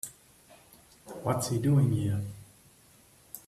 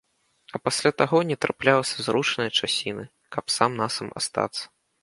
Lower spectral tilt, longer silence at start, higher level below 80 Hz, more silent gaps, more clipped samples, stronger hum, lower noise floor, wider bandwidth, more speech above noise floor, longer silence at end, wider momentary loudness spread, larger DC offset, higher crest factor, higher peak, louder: first, -6.5 dB/octave vs -3.5 dB/octave; second, 0.05 s vs 0.55 s; about the same, -60 dBFS vs -64 dBFS; neither; neither; neither; about the same, -59 dBFS vs -57 dBFS; first, 15 kHz vs 11.5 kHz; about the same, 32 dB vs 32 dB; second, 0.1 s vs 0.35 s; first, 22 LU vs 13 LU; neither; second, 18 dB vs 24 dB; second, -14 dBFS vs -2 dBFS; second, -29 LUFS vs -24 LUFS